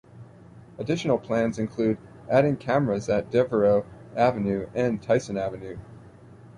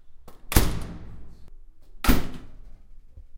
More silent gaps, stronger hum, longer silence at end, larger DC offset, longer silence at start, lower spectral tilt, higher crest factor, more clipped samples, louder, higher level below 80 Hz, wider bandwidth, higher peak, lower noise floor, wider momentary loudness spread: neither; neither; about the same, 0 s vs 0 s; neither; about the same, 0.15 s vs 0.05 s; first, -7 dB/octave vs -4.5 dB/octave; second, 18 dB vs 26 dB; neither; about the same, -25 LUFS vs -26 LUFS; second, -56 dBFS vs -30 dBFS; second, 11 kHz vs 16.5 kHz; second, -8 dBFS vs 0 dBFS; first, -48 dBFS vs -43 dBFS; second, 11 LU vs 22 LU